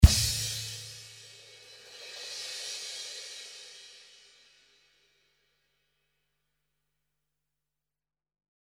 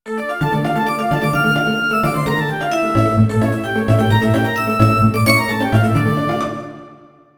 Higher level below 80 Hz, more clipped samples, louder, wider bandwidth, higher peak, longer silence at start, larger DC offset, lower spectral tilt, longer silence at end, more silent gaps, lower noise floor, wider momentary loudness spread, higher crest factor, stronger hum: first, -34 dBFS vs -40 dBFS; neither; second, -32 LUFS vs -16 LUFS; second, 17.5 kHz vs over 20 kHz; about the same, -2 dBFS vs 0 dBFS; about the same, 0 s vs 0.05 s; neither; second, -3.5 dB/octave vs -6.5 dB/octave; first, 5 s vs 0.45 s; neither; first, under -90 dBFS vs -44 dBFS; first, 21 LU vs 6 LU; first, 30 dB vs 16 dB; first, 50 Hz at -90 dBFS vs none